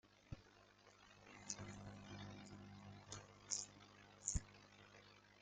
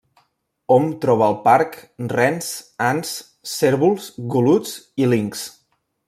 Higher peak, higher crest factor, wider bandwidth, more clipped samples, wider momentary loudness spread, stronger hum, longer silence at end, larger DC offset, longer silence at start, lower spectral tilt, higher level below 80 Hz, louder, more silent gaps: second, -22 dBFS vs -2 dBFS; first, 32 dB vs 18 dB; second, 9.6 kHz vs 16 kHz; neither; first, 20 LU vs 13 LU; first, 50 Hz at -65 dBFS vs none; second, 0 s vs 0.6 s; neither; second, 0.05 s vs 0.7 s; second, -3 dB/octave vs -5.5 dB/octave; about the same, -62 dBFS vs -64 dBFS; second, -52 LUFS vs -19 LUFS; neither